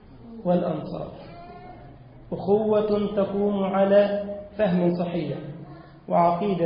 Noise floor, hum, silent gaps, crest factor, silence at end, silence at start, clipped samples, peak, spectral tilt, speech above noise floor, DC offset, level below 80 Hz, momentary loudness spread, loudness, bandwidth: -45 dBFS; none; none; 18 dB; 0 s; 0.1 s; under 0.1%; -6 dBFS; -12 dB/octave; 23 dB; under 0.1%; -54 dBFS; 22 LU; -24 LUFS; 5.2 kHz